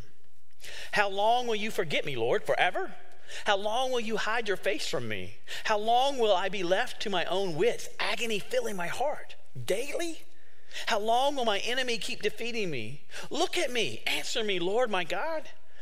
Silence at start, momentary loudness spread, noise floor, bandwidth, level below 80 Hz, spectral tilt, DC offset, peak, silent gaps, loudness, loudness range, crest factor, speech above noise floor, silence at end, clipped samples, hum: 0.6 s; 12 LU; -67 dBFS; 16 kHz; -62 dBFS; -3 dB/octave; 3%; -8 dBFS; none; -30 LUFS; 3 LU; 22 dB; 37 dB; 0.3 s; under 0.1%; none